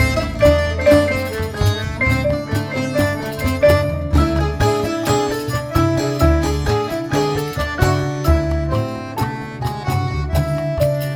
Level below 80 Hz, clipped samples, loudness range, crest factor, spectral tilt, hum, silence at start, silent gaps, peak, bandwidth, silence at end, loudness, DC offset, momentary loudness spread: -26 dBFS; under 0.1%; 3 LU; 16 dB; -6 dB/octave; none; 0 s; none; 0 dBFS; 18 kHz; 0 s; -18 LUFS; under 0.1%; 8 LU